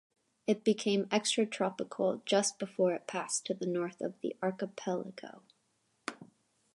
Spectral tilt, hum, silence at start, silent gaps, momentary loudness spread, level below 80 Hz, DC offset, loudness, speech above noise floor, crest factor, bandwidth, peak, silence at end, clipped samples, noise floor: -4 dB/octave; none; 0.5 s; none; 14 LU; -84 dBFS; under 0.1%; -33 LUFS; 43 dB; 20 dB; 11.5 kHz; -14 dBFS; 0.5 s; under 0.1%; -76 dBFS